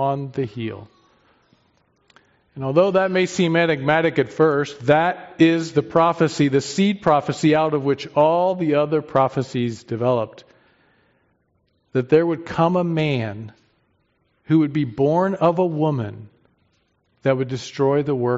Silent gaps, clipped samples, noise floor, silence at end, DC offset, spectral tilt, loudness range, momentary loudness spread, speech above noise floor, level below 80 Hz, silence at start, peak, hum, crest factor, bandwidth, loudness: none; under 0.1%; -66 dBFS; 0 s; under 0.1%; -5.5 dB/octave; 5 LU; 9 LU; 47 dB; -60 dBFS; 0 s; -4 dBFS; none; 18 dB; 8 kHz; -20 LUFS